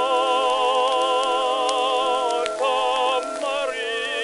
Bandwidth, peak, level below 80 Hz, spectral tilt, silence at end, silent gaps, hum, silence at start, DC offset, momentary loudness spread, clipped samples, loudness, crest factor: 11.5 kHz; -2 dBFS; -64 dBFS; -0.5 dB/octave; 0 s; none; none; 0 s; under 0.1%; 5 LU; under 0.1%; -21 LUFS; 18 dB